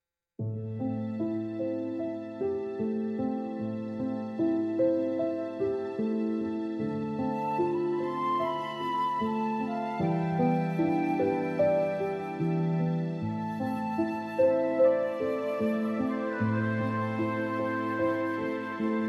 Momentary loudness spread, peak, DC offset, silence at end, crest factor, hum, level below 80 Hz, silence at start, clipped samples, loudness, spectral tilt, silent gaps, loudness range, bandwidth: 7 LU; -14 dBFS; under 0.1%; 0 s; 16 dB; none; -68 dBFS; 0.4 s; under 0.1%; -30 LUFS; -8.5 dB/octave; none; 4 LU; 12 kHz